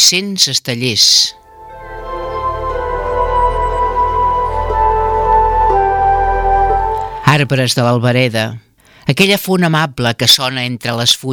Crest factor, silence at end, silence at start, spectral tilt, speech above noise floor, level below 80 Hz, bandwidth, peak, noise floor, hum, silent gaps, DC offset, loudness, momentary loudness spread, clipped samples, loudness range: 14 dB; 0 s; 0 s; -3.5 dB/octave; 20 dB; -26 dBFS; over 20 kHz; 0 dBFS; -33 dBFS; none; none; under 0.1%; -13 LUFS; 10 LU; under 0.1%; 3 LU